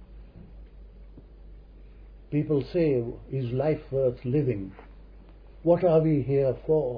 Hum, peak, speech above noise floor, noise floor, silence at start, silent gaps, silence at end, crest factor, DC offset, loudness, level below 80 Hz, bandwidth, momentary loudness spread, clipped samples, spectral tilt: none; -10 dBFS; 23 dB; -48 dBFS; 0 s; none; 0 s; 18 dB; under 0.1%; -26 LUFS; -48 dBFS; 5.2 kHz; 10 LU; under 0.1%; -11.5 dB/octave